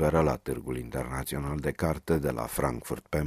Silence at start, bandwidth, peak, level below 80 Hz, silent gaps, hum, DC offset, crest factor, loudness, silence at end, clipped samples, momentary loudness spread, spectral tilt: 0 s; 16 kHz; -10 dBFS; -42 dBFS; none; none; under 0.1%; 20 dB; -31 LUFS; 0 s; under 0.1%; 7 LU; -6.5 dB/octave